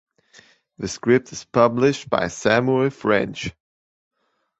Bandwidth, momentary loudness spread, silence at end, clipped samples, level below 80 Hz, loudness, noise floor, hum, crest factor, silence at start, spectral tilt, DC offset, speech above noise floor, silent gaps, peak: 8.2 kHz; 13 LU; 1.1 s; under 0.1%; -54 dBFS; -20 LUFS; -53 dBFS; none; 20 dB; 0.8 s; -5.5 dB/octave; under 0.1%; 33 dB; none; -2 dBFS